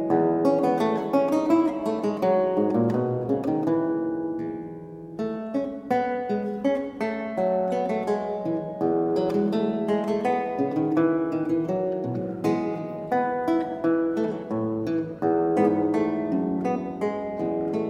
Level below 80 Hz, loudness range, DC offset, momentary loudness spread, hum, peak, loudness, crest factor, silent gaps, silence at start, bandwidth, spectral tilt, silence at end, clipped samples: -62 dBFS; 4 LU; under 0.1%; 7 LU; none; -8 dBFS; -25 LUFS; 16 dB; none; 0 s; 10 kHz; -8 dB/octave; 0 s; under 0.1%